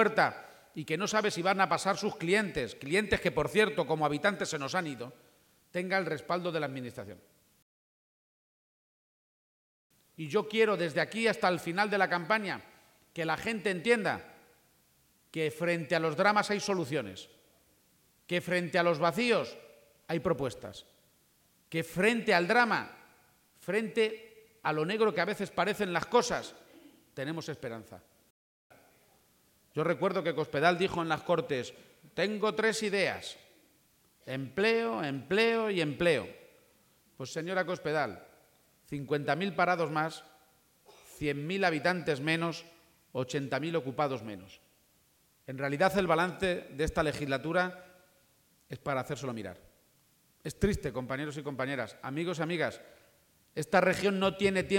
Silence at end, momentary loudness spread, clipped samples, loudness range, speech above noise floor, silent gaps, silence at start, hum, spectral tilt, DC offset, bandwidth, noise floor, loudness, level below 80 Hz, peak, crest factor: 0 s; 15 LU; under 0.1%; 7 LU; 38 dB; 7.62-9.90 s, 28.30-28.70 s; 0 s; none; -5 dB/octave; under 0.1%; 17 kHz; -68 dBFS; -31 LUFS; -60 dBFS; -10 dBFS; 22 dB